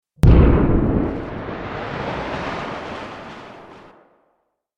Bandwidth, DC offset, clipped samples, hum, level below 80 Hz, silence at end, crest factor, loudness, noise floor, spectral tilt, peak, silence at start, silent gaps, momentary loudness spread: 8 kHz; under 0.1%; under 0.1%; none; -24 dBFS; 1 s; 20 dB; -20 LUFS; -69 dBFS; -8.5 dB/octave; 0 dBFS; 0.25 s; none; 22 LU